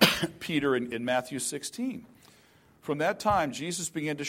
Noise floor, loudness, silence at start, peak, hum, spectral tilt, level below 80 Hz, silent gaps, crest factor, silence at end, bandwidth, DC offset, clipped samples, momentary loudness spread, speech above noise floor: -60 dBFS; -30 LUFS; 0 s; -6 dBFS; none; -3.5 dB/octave; -60 dBFS; none; 24 dB; 0 s; 16.5 kHz; under 0.1%; under 0.1%; 9 LU; 30 dB